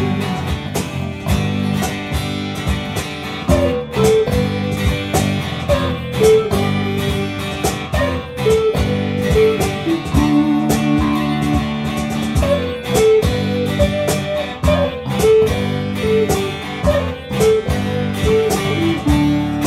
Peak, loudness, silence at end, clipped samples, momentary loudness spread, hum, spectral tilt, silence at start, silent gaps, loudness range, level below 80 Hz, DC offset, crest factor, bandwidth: -2 dBFS; -17 LUFS; 0 s; under 0.1%; 7 LU; none; -6 dB/octave; 0 s; none; 2 LU; -28 dBFS; under 0.1%; 14 dB; 16 kHz